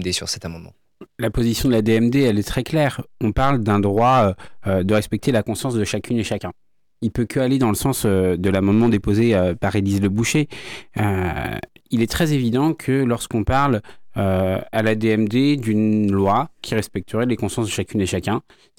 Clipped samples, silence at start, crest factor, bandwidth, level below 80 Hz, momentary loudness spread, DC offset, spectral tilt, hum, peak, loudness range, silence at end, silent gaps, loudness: under 0.1%; 0 s; 14 dB; 18.5 kHz; -40 dBFS; 9 LU; under 0.1%; -6 dB/octave; none; -6 dBFS; 3 LU; 0.4 s; none; -20 LUFS